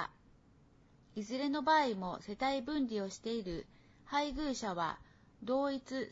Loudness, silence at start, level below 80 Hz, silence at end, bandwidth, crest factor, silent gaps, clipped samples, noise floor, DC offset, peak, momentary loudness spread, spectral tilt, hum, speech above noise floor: -37 LUFS; 0 s; -60 dBFS; 0 s; 7.6 kHz; 20 dB; none; under 0.1%; -65 dBFS; under 0.1%; -18 dBFS; 15 LU; -3 dB/octave; none; 29 dB